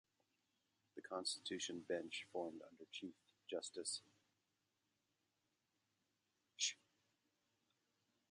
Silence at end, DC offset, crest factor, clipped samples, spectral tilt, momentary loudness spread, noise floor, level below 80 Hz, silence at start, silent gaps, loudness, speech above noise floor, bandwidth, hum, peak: 1.55 s; under 0.1%; 26 dB; under 0.1%; -1.5 dB/octave; 17 LU; -88 dBFS; under -90 dBFS; 0.95 s; none; -47 LUFS; 39 dB; 11 kHz; none; -26 dBFS